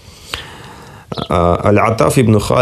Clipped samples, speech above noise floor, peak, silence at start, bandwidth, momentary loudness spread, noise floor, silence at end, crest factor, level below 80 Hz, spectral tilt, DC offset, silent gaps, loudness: under 0.1%; 24 dB; 0 dBFS; 0.25 s; 14 kHz; 20 LU; -35 dBFS; 0 s; 14 dB; -36 dBFS; -6 dB/octave; under 0.1%; none; -12 LUFS